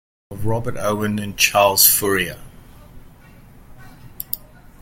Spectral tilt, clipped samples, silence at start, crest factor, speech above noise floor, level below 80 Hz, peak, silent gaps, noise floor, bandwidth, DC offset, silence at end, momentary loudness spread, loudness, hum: -2.5 dB/octave; under 0.1%; 0.3 s; 22 dB; 27 dB; -44 dBFS; 0 dBFS; none; -45 dBFS; 17 kHz; under 0.1%; 0.45 s; 19 LU; -17 LUFS; none